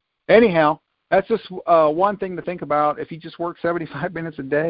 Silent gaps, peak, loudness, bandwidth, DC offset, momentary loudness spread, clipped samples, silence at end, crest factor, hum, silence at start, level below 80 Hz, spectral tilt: none; -2 dBFS; -20 LUFS; 5.2 kHz; under 0.1%; 14 LU; under 0.1%; 0 s; 18 dB; none; 0.3 s; -56 dBFS; -11 dB/octave